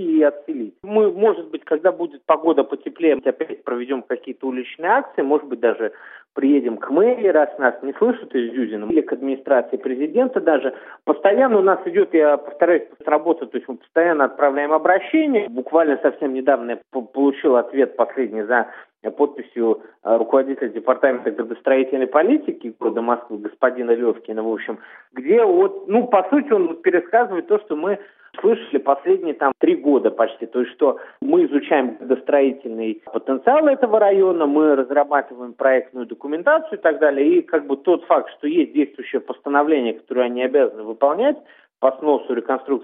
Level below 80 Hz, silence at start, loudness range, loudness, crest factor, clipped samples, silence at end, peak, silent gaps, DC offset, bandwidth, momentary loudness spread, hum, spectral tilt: -76 dBFS; 0 s; 3 LU; -19 LUFS; 18 dB; under 0.1%; 0 s; 0 dBFS; none; under 0.1%; 3.9 kHz; 10 LU; none; -10 dB/octave